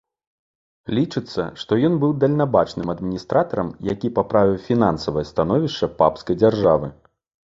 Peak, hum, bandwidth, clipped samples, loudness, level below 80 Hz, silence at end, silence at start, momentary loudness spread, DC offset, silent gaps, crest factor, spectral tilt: -2 dBFS; none; 7.8 kHz; under 0.1%; -20 LUFS; -48 dBFS; 0.65 s; 0.9 s; 8 LU; under 0.1%; none; 18 dB; -8 dB/octave